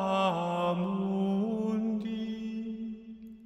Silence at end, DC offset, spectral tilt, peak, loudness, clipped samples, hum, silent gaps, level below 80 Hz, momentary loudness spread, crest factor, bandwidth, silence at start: 0 s; under 0.1%; -7.5 dB/octave; -14 dBFS; -32 LUFS; under 0.1%; none; none; -66 dBFS; 11 LU; 16 dB; 8.4 kHz; 0 s